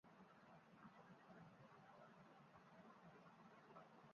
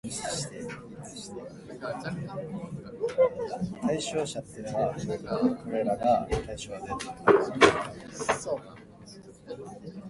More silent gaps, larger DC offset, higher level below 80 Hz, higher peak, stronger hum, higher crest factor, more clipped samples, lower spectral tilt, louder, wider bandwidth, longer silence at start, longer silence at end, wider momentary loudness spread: neither; neither; second, under -90 dBFS vs -52 dBFS; second, -50 dBFS vs -4 dBFS; neither; second, 16 dB vs 26 dB; neither; about the same, -5 dB/octave vs -4.5 dB/octave; second, -67 LUFS vs -29 LUFS; second, 6.8 kHz vs 11.5 kHz; about the same, 0.05 s vs 0.05 s; about the same, 0 s vs 0 s; second, 3 LU vs 19 LU